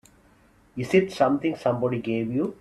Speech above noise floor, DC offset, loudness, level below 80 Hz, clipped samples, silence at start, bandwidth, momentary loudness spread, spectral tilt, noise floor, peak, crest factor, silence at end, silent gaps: 34 dB; under 0.1%; -25 LUFS; -60 dBFS; under 0.1%; 0.75 s; 12 kHz; 7 LU; -7 dB/octave; -58 dBFS; -6 dBFS; 20 dB; 0.05 s; none